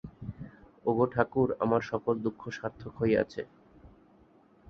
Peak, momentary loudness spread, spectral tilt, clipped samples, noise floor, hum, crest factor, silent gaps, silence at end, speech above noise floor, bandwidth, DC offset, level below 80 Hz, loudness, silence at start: -8 dBFS; 16 LU; -8 dB/octave; under 0.1%; -61 dBFS; none; 24 dB; none; 0.8 s; 32 dB; 6.8 kHz; under 0.1%; -58 dBFS; -30 LUFS; 0.05 s